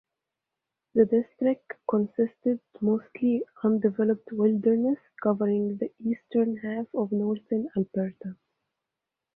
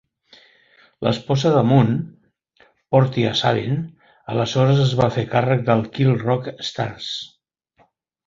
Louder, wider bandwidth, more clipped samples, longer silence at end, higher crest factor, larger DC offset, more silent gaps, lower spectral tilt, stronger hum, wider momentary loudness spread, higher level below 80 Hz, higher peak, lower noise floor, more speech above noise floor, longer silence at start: second, -27 LUFS vs -20 LUFS; second, 3.9 kHz vs 7.6 kHz; neither; about the same, 1 s vs 1 s; about the same, 18 dB vs 18 dB; neither; neither; first, -12 dB/octave vs -7 dB/octave; neither; second, 7 LU vs 12 LU; second, -72 dBFS vs -54 dBFS; second, -8 dBFS vs -2 dBFS; first, -87 dBFS vs -61 dBFS; first, 61 dB vs 43 dB; about the same, 0.95 s vs 1 s